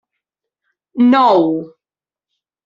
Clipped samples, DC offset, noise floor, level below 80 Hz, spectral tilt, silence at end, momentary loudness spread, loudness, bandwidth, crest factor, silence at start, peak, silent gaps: under 0.1%; under 0.1%; under -90 dBFS; -66 dBFS; -7.5 dB/octave; 1 s; 14 LU; -13 LUFS; 7 kHz; 16 dB; 0.95 s; -2 dBFS; none